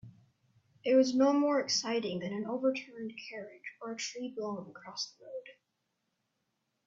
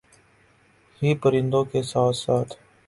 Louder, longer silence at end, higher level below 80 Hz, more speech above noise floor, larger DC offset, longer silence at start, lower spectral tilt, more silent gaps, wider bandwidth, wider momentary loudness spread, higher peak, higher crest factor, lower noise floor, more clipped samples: second, -32 LUFS vs -23 LUFS; first, 1.35 s vs 0.3 s; second, -80 dBFS vs -58 dBFS; first, 50 dB vs 37 dB; neither; second, 0.05 s vs 1 s; second, -4 dB/octave vs -6.5 dB/octave; neither; second, 7.8 kHz vs 11.5 kHz; first, 18 LU vs 5 LU; second, -14 dBFS vs -8 dBFS; about the same, 20 dB vs 16 dB; first, -82 dBFS vs -59 dBFS; neither